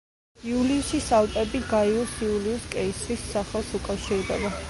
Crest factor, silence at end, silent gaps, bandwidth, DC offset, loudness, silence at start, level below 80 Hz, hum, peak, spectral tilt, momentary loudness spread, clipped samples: 16 dB; 0 s; none; 11.5 kHz; under 0.1%; -26 LUFS; 0.4 s; -42 dBFS; none; -10 dBFS; -4.5 dB/octave; 8 LU; under 0.1%